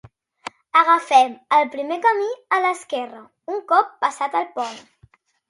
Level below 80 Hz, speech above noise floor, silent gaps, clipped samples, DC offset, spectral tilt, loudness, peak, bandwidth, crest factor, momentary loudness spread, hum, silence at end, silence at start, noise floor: -70 dBFS; 36 dB; none; under 0.1%; under 0.1%; -2.5 dB/octave; -20 LUFS; -2 dBFS; 11.5 kHz; 20 dB; 17 LU; none; 0.7 s; 0.75 s; -56 dBFS